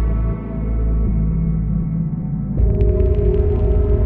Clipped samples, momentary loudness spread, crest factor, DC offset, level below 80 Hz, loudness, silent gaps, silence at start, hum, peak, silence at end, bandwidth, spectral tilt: under 0.1%; 6 LU; 12 dB; under 0.1%; -18 dBFS; -19 LUFS; none; 0 s; none; -4 dBFS; 0 s; 2.9 kHz; -13 dB/octave